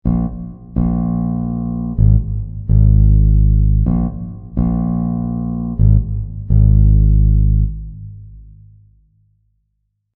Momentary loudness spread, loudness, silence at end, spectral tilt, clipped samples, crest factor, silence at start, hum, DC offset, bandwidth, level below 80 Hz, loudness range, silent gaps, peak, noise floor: 13 LU; -16 LUFS; 1.75 s; -15.5 dB/octave; under 0.1%; 14 dB; 0.05 s; none; under 0.1%; 1.2 kHz; -18 dBFS; 2 LU; none; 0 dBFS; -69 dBFS